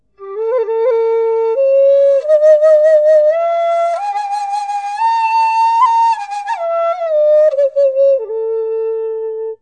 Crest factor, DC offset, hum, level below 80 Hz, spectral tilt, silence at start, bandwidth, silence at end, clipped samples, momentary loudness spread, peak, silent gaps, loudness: 10 dB; under 0.1%; none; -72 dBFS; -1 dB/octave; 0.2 s; 9.6 kHz; 0.05 s; under 0.1%; 10 LU; -2 dBFS; none; -13 LUFS